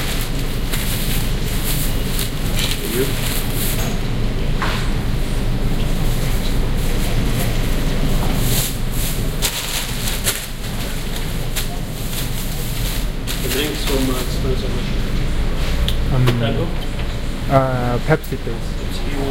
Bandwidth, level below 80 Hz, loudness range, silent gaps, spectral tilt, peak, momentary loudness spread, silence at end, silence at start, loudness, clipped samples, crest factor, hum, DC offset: 17 kHz; -20 dBFS; 2 LU; none; -4.5 dB/octave; 0 dBFS; 7 LU; 0 s; 0 s; -21 LUFS; under 0.1%; 18 dB; none; under 0.1%